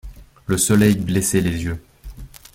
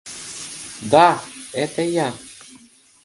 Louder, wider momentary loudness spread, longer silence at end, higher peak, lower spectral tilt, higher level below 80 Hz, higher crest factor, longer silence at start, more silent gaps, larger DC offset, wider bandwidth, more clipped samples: about the same, -18 LUFS vs -20 LUFS; about the same, 19 LU vs 21 LU; second, 0.3 s vs 0.75 s; about the same, -2 dBFS vs 0 dBFS; about the same, -5 dB/octave vs -4 dB/octave; first, -40 dBFS vs -62 dBFS; about the same, 18 dB vs 22 dB; about the same, 0.05 s vs 0.05 s; neither; neither; first, 16.5 kHz vs 11.5 kHz; neither